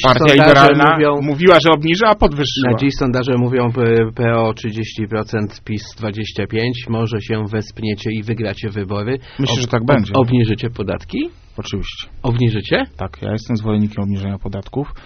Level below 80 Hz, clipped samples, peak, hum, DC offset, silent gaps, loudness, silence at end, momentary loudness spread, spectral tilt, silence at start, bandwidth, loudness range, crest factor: -34 dBFS; 0.1%; 0 dBFS; none; under 0.1%; none; -16 LUFS; 0.05 s; 15 LU; -6.5 dB/octave; 0 s; 7.6 kHz; 9 LU; 16 dB